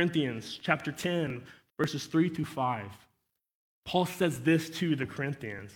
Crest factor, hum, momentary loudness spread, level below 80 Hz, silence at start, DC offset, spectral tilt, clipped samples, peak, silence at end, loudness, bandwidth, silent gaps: 22 dB; none; 10 LU; -66 dBFS; 0 s; under 0.1%; -5.5 dB/octave; under 0.1%; -10 dBFS; 0 s; -31 LUFS; 18 kHz; 3.54-3.83 s